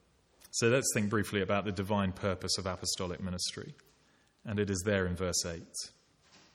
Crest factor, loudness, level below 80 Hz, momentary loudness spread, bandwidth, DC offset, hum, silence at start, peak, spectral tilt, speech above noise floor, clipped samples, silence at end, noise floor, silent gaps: 20 dB; -33 LUFS; -60 dBFS; 12 LU; 16.5 kHz; under 0.1%; none; 0.55 s; -14 dBFS; -4 dB/octave; 35 dB; under 0.1%; 0.2 s; -68 dBFS; none